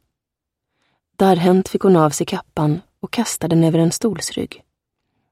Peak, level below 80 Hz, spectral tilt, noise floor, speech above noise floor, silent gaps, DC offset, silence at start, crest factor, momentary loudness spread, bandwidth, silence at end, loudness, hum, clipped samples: -2 dBFS; -54 dBFS; -6 dB/octave; -83 dBFS; 66 dB; none; under 0.1%; 1.2 s; 16 dB; 11 LU; 15.5 kHz; 0.85 s; -18 LUFS; none; under 0.1%